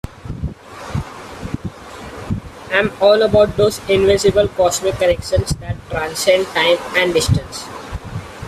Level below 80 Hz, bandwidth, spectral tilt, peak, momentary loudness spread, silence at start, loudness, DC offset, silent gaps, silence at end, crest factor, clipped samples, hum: -36 dBFS; 15 kHz; -4.5 dB/octave; 0 dBFS; 17 LU; 0.05 s; -16 LUFS; under 0.1%; none; 0 s; 16 dB; under 0.1%; none